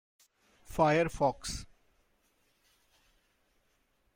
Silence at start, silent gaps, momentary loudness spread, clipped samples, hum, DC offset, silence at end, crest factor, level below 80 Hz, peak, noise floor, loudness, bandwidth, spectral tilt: 0.7 s; none; 14 LU; under 0.1%; none; under 0.1%; 2.5 s; 22 dB; -54 dBFS; -14 dBFS; -74 dBFS; -31 LUFS; 16.5 kHz; -5 dB/octave